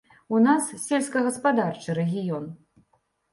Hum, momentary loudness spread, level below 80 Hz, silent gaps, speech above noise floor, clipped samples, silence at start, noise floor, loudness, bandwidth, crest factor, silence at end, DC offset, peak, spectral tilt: none; 10 LU; -70 dBFS; none; 45 dB; under 0.1%; 0.3 s; -69 dBFS; -24 LUFS; 11.5 kHz; 16 dB; 0.8 s; under 0.1%; -10 dBFS; -5.5 dB/octave